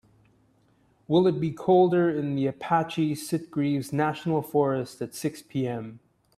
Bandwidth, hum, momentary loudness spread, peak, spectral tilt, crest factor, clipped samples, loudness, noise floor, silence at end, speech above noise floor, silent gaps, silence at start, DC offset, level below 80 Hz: 14.5 kHz; none; 10 LU; -10 dBFS; -7 dB/octave; 18 dB; under 0.1%; -26 LUFS; -64 dBFS; 0.4 s; 39 dB; none; 1.1 s; under 0.1%; -66 dBFS